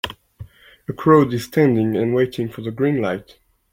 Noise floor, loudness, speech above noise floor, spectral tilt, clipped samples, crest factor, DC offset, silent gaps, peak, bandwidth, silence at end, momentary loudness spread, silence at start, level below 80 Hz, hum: -41 dBFS; -19 LUFS; 23 dB; -7.5 dB/octave; under 0.1%; 18 dB; under 0.1%; none; -2 dBFS; 16.5 kHz; 0.5 s; 16 LU; 0.05 s; -52 dBFS; none